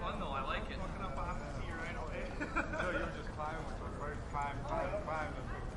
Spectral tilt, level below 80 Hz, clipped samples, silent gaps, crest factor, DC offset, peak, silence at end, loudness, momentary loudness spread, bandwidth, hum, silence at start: -6 dB/octave; -46 dBFS; under 0.1%; none; 18 dB; under 0.1%; -20 dBFS; 0 s; -40 LUFS; 6 LU; 11.5 kHz; none; 0 s